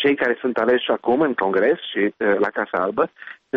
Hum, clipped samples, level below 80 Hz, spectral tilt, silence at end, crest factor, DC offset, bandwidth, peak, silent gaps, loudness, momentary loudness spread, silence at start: none; under 0.1%; -62 dBFS; -2.5 dB/octave; 0 s; 14 dB; under 0.1%; 5.6 kHz; -8 dBFS; none; -20 LUFS; 4 LU; 0 s